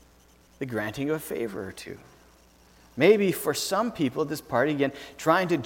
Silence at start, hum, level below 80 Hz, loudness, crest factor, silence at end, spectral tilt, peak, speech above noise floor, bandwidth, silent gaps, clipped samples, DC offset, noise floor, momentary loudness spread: 0.6 s; none; -60 dBFS; -26 LUFS; 22 dB; 0 s; -5 dB/octave; -6 dBFS; 31 dB; 18 kHz; none; under 0.1%; under 0.1%; -57 dBFS; 17 LU